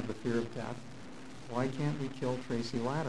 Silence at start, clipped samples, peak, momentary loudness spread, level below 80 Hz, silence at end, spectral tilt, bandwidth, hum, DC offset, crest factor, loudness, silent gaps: 0 s; under 0.1%; -20 dBFS; 14 LU; -62 dBFS; 0 s; -6.5 dB/octave; 11.5 kHz; none; 0.5%; 18 dB; -36 LUFS; none